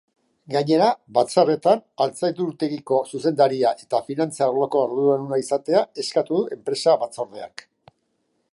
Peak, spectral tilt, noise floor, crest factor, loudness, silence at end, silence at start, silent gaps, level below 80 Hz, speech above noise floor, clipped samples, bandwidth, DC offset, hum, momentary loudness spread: -4 dBFS; -5.5 dB/octave; -71 dBFS; 18 dB; -22 LUFS; 1.05 s; 0.5 s; none; -74 dBFS; 50 dB; under 0.1%; 11.5 kHz; under 0.1%; none; 8 LU